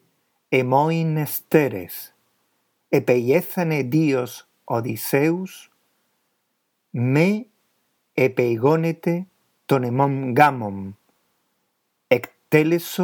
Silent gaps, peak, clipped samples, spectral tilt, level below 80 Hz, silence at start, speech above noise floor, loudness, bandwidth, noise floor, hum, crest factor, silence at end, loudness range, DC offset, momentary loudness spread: none; 0 dBFS; under 0.1%; -7 dB/octave; -74 dBFS; 0.5 s; 53 dB; -21 LUFS; over 20 kHz; -73 dBFS; none; 22 dB; 0 s; 4 LU; under 0.1%; 15 LU